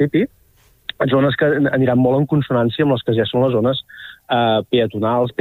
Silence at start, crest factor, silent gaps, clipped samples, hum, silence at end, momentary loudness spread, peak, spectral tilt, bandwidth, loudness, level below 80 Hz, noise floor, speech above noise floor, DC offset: 0 s; 14 dB; none; under 0.1%; none; 0.1 s; 10 LU; -4 dBFS; -8.5 dB/octave; 15.5 kHz; -17 LUFS; -52 dBFS; -54 dBFS; 37 dB; under 0.1%